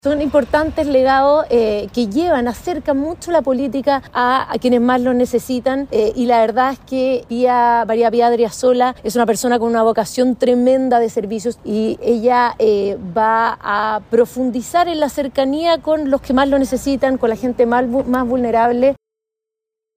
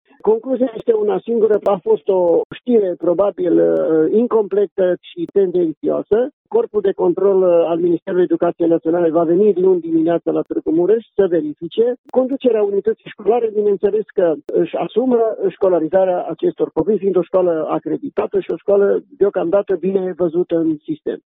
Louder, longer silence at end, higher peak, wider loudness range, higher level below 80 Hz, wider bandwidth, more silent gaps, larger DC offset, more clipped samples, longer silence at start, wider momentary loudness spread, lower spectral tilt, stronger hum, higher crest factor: about the same, -16 LUFS vs -17 LUFS; first, 1.05 s vs 0.2 s; about the same, -2 dBFS vs -2 dBFS; about the same, 2 LU vs 2 LU; first, -44 dBFS vs -58 dBFS; first, 16 kHz vs 3.9 kHz; second, none vs 2.45-2.50 s, 4.71-4.76 s, 5.77-5.81 s, 6.33-6.45 s, 8.02-8.06 s, 11.98-12.04 s; neither; neither; second, 0.05 s vs 0.25 s; about the same, 5 LU vs 6 LU; second, -5 dB/octave vs -10.5 dB/octave; neither; about the same, 12 dB vs 14 dB